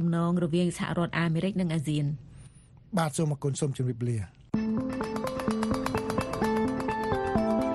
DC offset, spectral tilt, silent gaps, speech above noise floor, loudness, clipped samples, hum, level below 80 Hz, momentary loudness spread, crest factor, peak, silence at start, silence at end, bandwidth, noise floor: under 0.1%; -6.5 dB/octave; none; 24 dB; -29 LUFS; under 0.1%; none; -50 dBFS; 5 LU; 16 dB; -12 dBFS; 0 s; 0 s; 13 kHz; -52 dBFS